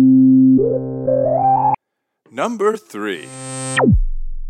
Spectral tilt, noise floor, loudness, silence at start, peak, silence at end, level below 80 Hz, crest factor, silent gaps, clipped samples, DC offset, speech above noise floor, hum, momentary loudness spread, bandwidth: -6.5 dB/octave; -75 dBFS; -16 LUFS; 0 s; -4 dBFS; 0 s; -26 dBFS; 12 dB; none; under 0.1%; under 0.1%; 53 dB; none; 16 LU; 10 kHz